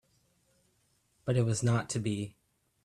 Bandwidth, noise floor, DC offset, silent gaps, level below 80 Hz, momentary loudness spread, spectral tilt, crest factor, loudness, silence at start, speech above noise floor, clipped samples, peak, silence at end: 12 kHz; -73 dBFS; under 0.1%; none; -64 dBFS; 12 LU; -6 dB/octave; 18 dB; -32 LUFS; 1.25 s; 43 dB; under 0.1%; -16 dBFS; 0.55 s